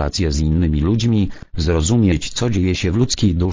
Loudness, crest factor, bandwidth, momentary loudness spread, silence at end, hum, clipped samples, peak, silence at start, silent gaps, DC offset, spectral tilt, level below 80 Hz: -18 LUFS; 14 dB; 8 kHz; 4 LU; 0 s; none; under 0.1%; -2 dBFS; 0 s; none; under 0.1%; -6 dB/octave; -24 dBFS